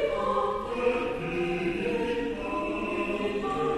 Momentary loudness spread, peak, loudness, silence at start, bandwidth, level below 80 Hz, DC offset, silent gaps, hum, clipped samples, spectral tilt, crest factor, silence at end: 3 LU; -14 dBFS; -29 LUFS; 0 s; 12.5 kHz; -48 dBFS; under 0.1%; none; none; under 0.1%; -6 dB/octave; 16 dB; 0 s